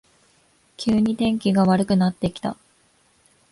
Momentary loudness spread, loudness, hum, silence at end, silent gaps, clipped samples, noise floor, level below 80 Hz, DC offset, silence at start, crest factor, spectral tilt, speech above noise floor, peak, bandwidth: 12 LU; -21 LUFS; none; 1 s; none; under 0.1%; -61 dBFS; -52 dBFS; under 0.1%; 0.8 s; 16 dB; -7 dB/octave; 41 dB; -8 dBFS; 11.5 kHz